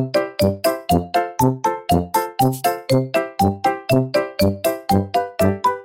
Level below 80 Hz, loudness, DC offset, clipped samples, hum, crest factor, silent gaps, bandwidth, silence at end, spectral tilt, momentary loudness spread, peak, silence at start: -44 dBFS; -19 LUFS; under 0.1%; under 0.1%; none; 16 dB; none; 17 kHz; 0 s; -6 dB/octave; 4 LU; -2 dBFS; 0 s